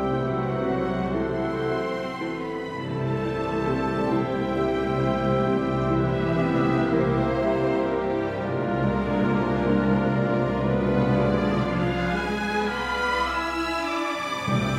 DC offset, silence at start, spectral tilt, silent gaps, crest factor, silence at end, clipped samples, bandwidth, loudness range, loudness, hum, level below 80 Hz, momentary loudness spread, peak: under 0.1%; 0 s; -7 dB/octave; none; 16 dB; 0 s; under 0.1%; 12.5 kHz; 4 LU; -25 LUFS; none; -42 dBFS; 5 LU; -8 dBFS